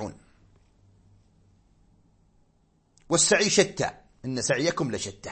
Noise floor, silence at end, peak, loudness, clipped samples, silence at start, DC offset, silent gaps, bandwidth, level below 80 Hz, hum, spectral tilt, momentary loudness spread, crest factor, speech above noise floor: -66 dBFS; 0 s; -6 dBFS; -24 LUFS; under 0.1%; 0 s; under 0.1%; none; 8.8 kHz; -60 dBFS; none; -3 dB/octave; 14 LU; 24 dB; 41 dB